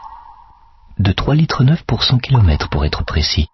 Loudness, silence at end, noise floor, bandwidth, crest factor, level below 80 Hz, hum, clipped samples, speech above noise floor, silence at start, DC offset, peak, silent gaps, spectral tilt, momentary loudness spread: -15 LUFS; 0.05 s; -45 dBFS; 6.2 kHz; 14 dB; -24 dBFS; none; under 0.1%; 31 dB; 0 s; under 0.1%; -2 dBFS; none; -6.5 dB/octave; 6 LU